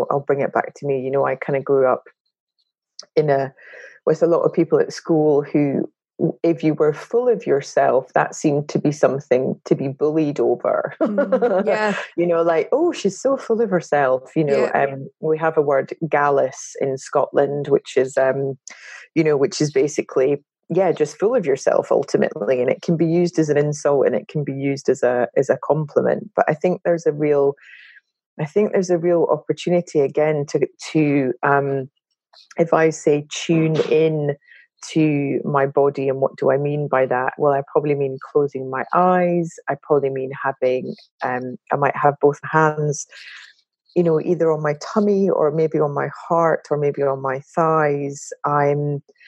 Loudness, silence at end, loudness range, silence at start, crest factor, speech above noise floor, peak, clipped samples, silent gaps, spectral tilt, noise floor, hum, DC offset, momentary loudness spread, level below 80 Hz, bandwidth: -19 LUFS; 0.3 s; 2 LU; 0 s; 18 dB; 54 dB; -2 dBFS; under 0.1%; 2.20-2.25 s, 2.40-2.47 s, 28.26-28.37 s, 41.11-41.19 s; -6.5 dB/octave; -73 dBFS; none; under 0.1%; 7 LU; -76 dBFS; 9.4 kHz